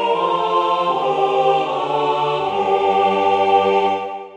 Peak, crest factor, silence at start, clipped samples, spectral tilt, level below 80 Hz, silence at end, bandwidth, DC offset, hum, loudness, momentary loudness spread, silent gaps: -4 dBFS; 14 dB; 0 s; under 0.1%; -5.5 dB/octave; -64 dBFS; 0 s; 9.4 kHz; under 0.1%; none; -17 LUFS; 4 LU; none